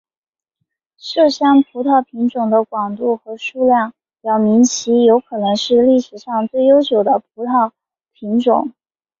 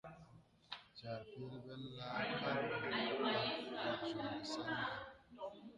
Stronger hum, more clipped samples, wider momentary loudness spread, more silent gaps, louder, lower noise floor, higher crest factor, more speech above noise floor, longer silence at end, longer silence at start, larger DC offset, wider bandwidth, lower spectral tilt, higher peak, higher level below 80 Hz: neither; neither; second, 10 LU vs 14 LU; neither; first, -15 LUFS vs -43 LUFS; first, -75 dBFS vs -64 dBFS; about the same, 14 dB vs 18 dB; first, 60 dB vs 22 dB; first, 0.5 s vs 0 s; first, 1.05 s vs 0.05 s; neither; second, 7.6 kHz vs 11 kHz; about the same, -4.5 dB/octave vs -5 dB/octave; first, -2 dBFS vs -26 dBFS; first, -60 dBFS vs -74 dBFS